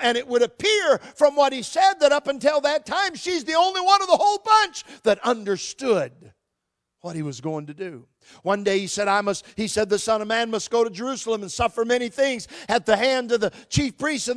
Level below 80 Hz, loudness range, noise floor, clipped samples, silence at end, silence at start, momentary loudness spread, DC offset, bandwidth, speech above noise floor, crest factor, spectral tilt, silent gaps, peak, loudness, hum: -52 dBFS; 7 LU; -81 dBFS; under 0.1%; 0 s; 0 s; 12 LU; under 0.1%; 11 kHz; 59 dB; 20 dB; -3.5 dB/octave; none; -2 dBFS; -22 LUFS; none